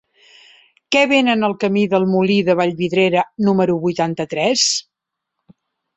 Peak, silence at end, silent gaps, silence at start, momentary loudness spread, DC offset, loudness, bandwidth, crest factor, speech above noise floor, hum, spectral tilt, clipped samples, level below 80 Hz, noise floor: -2 dBFS; 1.15 s; none; 0.9 s; 6 LU; under 0.1%; -16 LUFS; 8.4 kHz; 16 dB; 65 dB; none; -4.5 dB/octave; under 0.1%; -60 dBFS; -81 dBFS